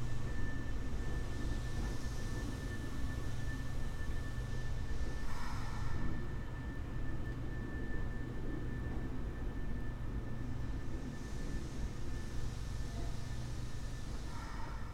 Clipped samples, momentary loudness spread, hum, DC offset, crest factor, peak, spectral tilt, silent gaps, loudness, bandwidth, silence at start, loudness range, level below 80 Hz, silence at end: under 0.1%; 3 LU; none; under 0.1%; 12 dB; -24 dBFS; -6 dB/octave; none; -43 LUFS; 12 kHz; 0 s; 2 LU; -42 dBFS; 0 s